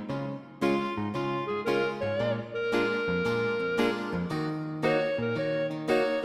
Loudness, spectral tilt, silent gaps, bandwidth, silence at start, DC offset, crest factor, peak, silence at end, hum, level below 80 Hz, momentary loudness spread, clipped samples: -29 LUFS; -6.5 dB/octave; none; 14 kHz; 0 s; under 0.1%; 16 dB; -12 dBFS; 0 s; none; -60 dBFS; 5 LU; under 0.1%